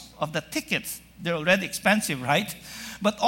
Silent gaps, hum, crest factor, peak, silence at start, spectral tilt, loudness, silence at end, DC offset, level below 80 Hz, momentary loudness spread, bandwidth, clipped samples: none; none; 20 dB; -6 dBFS; 0 s; -3.5 dB/octave; -26 LUFS; 0 s; under 0.1%; -58 dBFS; 12 LU; 17 kHz; under 0.1%